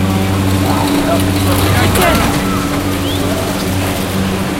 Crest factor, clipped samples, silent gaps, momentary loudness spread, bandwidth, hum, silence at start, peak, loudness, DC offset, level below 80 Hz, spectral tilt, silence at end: 12 dB; under 0.1%; none; 5 LU; 17 kHz; none; 0 s; 0 dBFS; -14 LUFS; under 0.1%; -28 dBFS; -5 dB/octave; 0 s